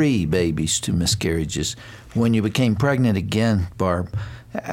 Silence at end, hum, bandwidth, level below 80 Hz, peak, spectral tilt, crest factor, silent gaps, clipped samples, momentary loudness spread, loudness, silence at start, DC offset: 0 s; none; 17 kHz; -40 dBFS; -6 dBFS; -5 dB/octave; 14 dB; none; under 0.1%; 10 LU; -21 LUFS; 0 s; under 0.1%